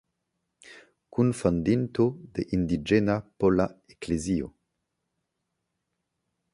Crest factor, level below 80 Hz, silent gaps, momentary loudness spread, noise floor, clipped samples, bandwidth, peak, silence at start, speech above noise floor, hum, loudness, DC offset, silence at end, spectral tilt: 20 dB; -50 dBFS; none; 9 LU; -81 dBFS; under 0.1%; 11.5 kHz; -8 dBFS; 0.7 s; 55 dB; none; -27 LUFS; under 0.1%; 2.05 s; -7 dB/octave